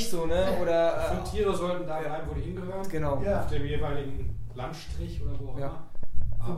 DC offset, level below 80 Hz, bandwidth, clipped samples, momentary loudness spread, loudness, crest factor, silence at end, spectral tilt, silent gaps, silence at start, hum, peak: under 0.1%; -36 dBFS; 14 kHz; under 0.1%; 12 LU; -31 LUFS; 14 dB; 0 s; -6 dB/octave; none; 0 s; none; -10 dBFS